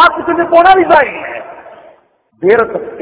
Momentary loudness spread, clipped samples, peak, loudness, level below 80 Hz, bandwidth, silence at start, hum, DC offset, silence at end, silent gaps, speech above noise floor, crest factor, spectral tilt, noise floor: 17 LU; 2%; 0 dBFS; -9 LUFS; -46 dBFS; 4 kHz; 0 s; none; under 0.1%; 0 s; none; 39 dB; 12 dB; -8 dB/octave; -49 dBFS